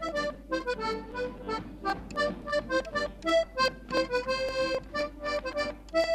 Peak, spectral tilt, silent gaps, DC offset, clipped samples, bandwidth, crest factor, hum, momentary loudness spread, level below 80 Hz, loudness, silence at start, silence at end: -14 dBFS; -4 dB/octave; none; under 0.1%; under 0.1%; 14 kHz; 16 dB; none; 7 LU; -48 dBFS; -31 LUFS; 0 s; 0 s